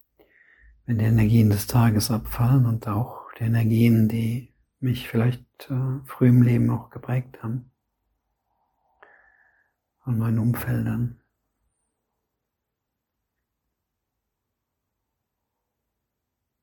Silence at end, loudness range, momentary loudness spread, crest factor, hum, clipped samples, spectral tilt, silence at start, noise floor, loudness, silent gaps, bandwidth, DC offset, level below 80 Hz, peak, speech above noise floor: 5.5 s; 12 LU; 14 LU; 18 dB; none; under 0.1%; -7.5 dB/octave; 0.9 s; -83 dBFS; -23 LUFS; none; 17.5 kHz; under 0.1%; -48 dBFS; -6 dBFS; 61 dB